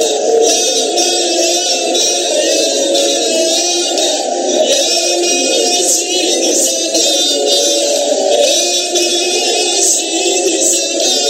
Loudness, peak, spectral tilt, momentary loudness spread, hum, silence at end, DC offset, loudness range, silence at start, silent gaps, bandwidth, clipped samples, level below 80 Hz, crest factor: -11 LUFS; 0 dBFS; 1 dB/octave; 2 LU; none; 0 s; under 0.1%; 1 LU; 0 s; none; 16.5 kHz; under 0.1%; -72 dBFS; 12 dB